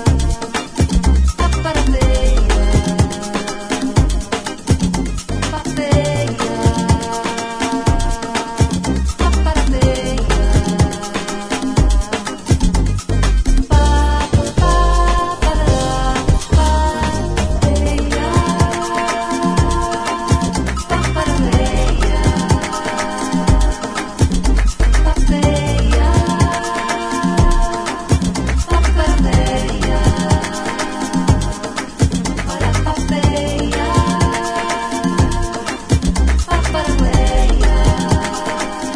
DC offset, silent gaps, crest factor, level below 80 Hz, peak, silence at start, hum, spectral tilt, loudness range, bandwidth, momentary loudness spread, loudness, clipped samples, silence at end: under 0.1%; none; 14 dB; -18 dBFS; 0 dBFS; 0 s; none; -5.5 dB/octave; 2 LU; 11 kHz; 6 LU; -17 LUFS; under 0.1%; 0 s